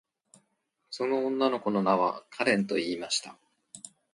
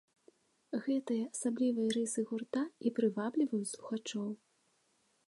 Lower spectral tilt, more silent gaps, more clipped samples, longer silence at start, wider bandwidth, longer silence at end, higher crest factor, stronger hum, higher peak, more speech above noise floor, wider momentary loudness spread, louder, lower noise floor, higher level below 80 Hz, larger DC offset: about the same, -4 dB/octave vs -4.5 dB/octave; neither; neither; first, 0.9 s vs 0.7 s; about the same, 11.5 kHz vs 11.5 kHz; second, 0.25 s vs 0.95 s; about the same, 20 dB vs 18 dB; neither; first, -10 dBFS vs -18 dBFS; first, 48 dB vs 40 dB; first, 20 LU vs 7 LU; first, -28 LUFS vs -36 LUFS; about the same, -77 dBFS vs -75 dBFS; first, -74 dBFS vs -86 dBFS; neither